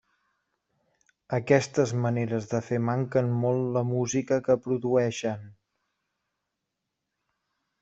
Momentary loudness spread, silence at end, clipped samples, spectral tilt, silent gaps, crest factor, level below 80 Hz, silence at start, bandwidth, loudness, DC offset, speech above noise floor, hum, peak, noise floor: 8 LU; 2.3 s; under 0.1%; -6.5 dB/octave; none; 22 dB; -66 dBFS; 1.3 s; 8 kHz; -27 LUFS; under 0.1%; 58 dB; none; -6 dBFS; -84 dBFS